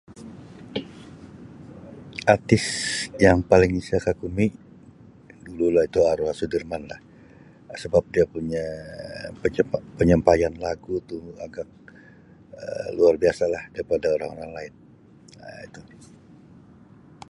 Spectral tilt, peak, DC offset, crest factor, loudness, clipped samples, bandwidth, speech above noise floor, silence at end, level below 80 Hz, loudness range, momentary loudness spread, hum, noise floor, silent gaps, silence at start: -5.5 dB/octave; -2 dBFS; under 0.1%; 24 dB; -23 LUFS; under 0.1%; 11.5 kHz; 28 dB; 1.5 s; -44 dBFS; 6 LU; 24 LU; none; -51 dBFS; none; 0.1 s